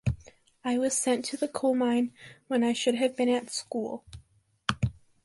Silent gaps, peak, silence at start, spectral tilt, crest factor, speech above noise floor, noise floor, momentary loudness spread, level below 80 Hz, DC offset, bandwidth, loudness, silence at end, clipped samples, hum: none; -6 dBFS; 0.05 s; -4.5 dB/octave; 24 dB; 34 dB; -62 dBFS; 8 LU; -50 dBFS; under 0.1%; 11.5 kHz; -29 LUFS; 0.35 s; under 0.1%; none